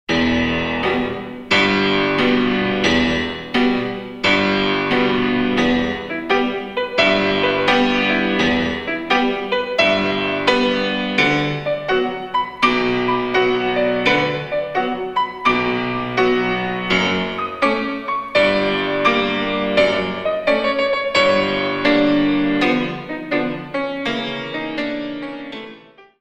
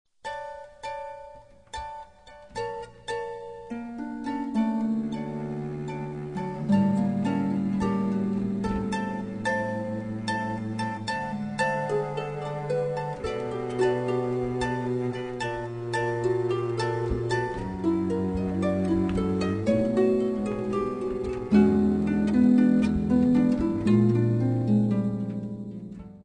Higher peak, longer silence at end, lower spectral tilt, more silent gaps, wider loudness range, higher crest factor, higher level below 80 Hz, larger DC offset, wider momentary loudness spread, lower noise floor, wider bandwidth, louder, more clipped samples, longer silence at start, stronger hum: first, 0 dBFS vs -8 dBFS; first, 0.2 s vs 0 s; second, -5 dB/octave vs -7.5 dB/octave; neither; second, 2 LU vs 9 LU; about the same, 18 dB vs 18 dB; about the same, -44 dBFS vs -48 dBFS; neither; second, 8 LU vs 15 LU; second, -43 dBFS vs -50 dBFS; about the same, 9.6 kHz vs 10.5 kHz; first, -18 LUFS vs -27 LUFS; neither; second, 0.1 s vs 0.25 s; neither